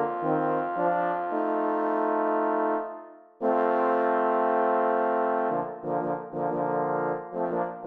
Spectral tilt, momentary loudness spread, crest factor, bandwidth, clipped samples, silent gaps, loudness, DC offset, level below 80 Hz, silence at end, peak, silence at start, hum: -9.5 dB/octave; 7 LU; 14 dB; 4.5 kHz; under 0.1%; none; -27 LUFS; under 0.1%; -80 dBFS; 0 s; -12 dBFS; 0 s; none